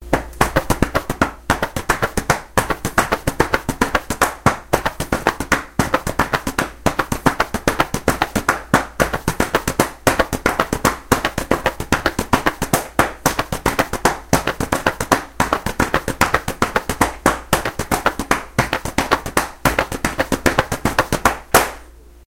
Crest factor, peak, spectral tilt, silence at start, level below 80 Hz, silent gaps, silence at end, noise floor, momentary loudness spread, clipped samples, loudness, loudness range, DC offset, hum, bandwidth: 20 dB; 0 dBFS; -4 dB/octave; 0 s; -32 dBFS; none; 0.25 s; -41 dBFS; 3 LU; under 0.1%; -19 LUFS; 1 LU; under 0.1%; none; over 20 kHz